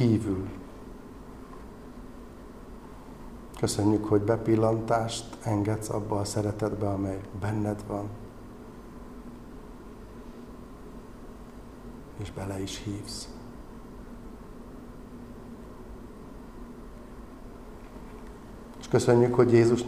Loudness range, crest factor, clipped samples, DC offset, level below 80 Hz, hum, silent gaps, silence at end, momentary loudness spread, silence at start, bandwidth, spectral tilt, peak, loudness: 18 LU; 22 dB; under 0.1%; 0.1%; -48 dBFS; none; none; 0 s; 21 LU; 0 s; 14.5 kHz; -6.5 dB/octave; -8 dBFS; -28 LUFS